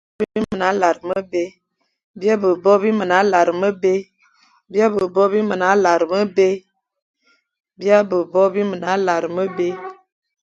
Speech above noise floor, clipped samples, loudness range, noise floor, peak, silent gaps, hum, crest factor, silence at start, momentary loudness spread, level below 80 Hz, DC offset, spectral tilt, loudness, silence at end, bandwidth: 40 dB; under 0.1%; 2 LU; -56 dBFS; 0 dBFS; 2.04-2.14 s, 7.02-7.14 s; none; 18 dB; 0.2 s; 9 LU; -60 dBFS; under 0.1%; -5.5 dB/octave; -18 LUFS; 0.5 s; 7.8 kHz